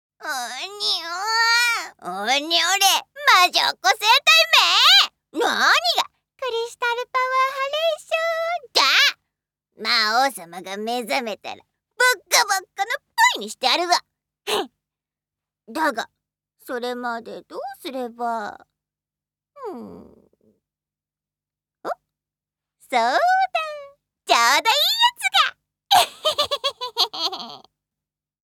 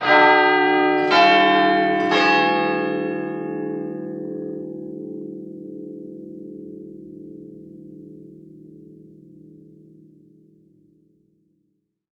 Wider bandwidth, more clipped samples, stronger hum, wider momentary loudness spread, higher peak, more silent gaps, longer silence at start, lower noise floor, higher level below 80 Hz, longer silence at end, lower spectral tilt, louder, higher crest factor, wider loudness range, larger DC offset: first, 20 kHz vs 8 kHz; neither; about the same, 50 Hz at -70 dBFS vs 60 Hz at -60 dBFS; second, 19 LU vs 25 LU; first, 0 dBFS vs -4 dBFS; neither; first, 0.2 s vs 0 s; first, under -90 dBFS vs -71 dBFS; second, -74 dBFS vs -68 dBFS; second, 0.85 s vs 3.3 s; second, 0.5 dB/octave vs -5.5 dB/octave; about the same, -19 LUFS vs -18 LUFS; about the same, 22 dB vs 18 dB; second, 16 LU vs 24 LU; neither